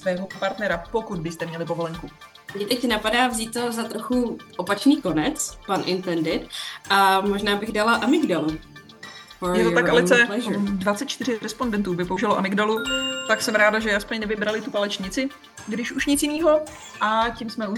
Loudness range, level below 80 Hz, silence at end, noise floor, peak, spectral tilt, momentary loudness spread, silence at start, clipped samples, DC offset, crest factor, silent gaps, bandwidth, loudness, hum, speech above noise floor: 4 LU; -48 dBFS; 0 s; -42 dBFS; -2 dBFS; -4 dB/octave; 12 LU; 0 s; under 0.1%; under 0.1%; 20 dB; none; 18.5 kHz; -23 LUFS; none; 20 dB